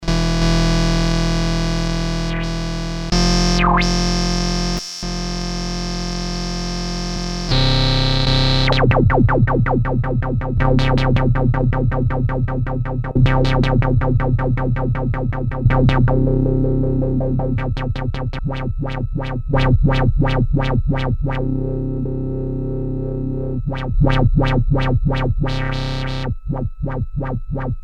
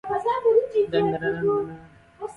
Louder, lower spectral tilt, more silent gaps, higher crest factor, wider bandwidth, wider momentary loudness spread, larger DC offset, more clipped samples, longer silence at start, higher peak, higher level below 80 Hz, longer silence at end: first, -19 LUFS vs -23 LUFS; second, -6 dB/octave vs -7.5 dB/octave; neither; about the same, 16 dB vs 16 dB; about the same, 9.8 kHz vs 9.8 kHz; about the same, 9 LU vs 10 LU; neither; neither; about the same, 0 s vs 0.05 s; first, -2 dBFS vs -8 dBFS; first, -22 dBFS vs -56 dBFS; about the same, 0 s vs 0 s